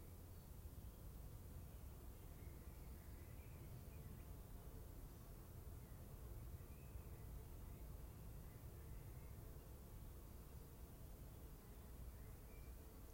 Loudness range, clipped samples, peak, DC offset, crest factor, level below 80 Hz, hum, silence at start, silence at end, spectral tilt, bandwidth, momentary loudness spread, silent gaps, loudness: 2 LU; under 0.1%; -44 dBFS; under 0.1%; 14 dB; -60 dBFS; none; 0 s; 0 s; -6 dB/octave; 16.5 kHz; 2 LU; none; -59 LUFS